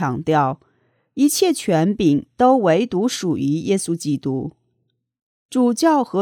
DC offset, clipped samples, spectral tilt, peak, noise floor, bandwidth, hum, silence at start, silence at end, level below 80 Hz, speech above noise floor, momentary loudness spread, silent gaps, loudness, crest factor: under 0.1%; under 0.1%; -5.5 dB/octave; -2 dBFS; -70 dBFS; 19 kHz; none; 0 s; 0 s; -56 dBFS; 53 dB; 9 LU; 5.22-5.49 s; -19 LUFS; 16 dB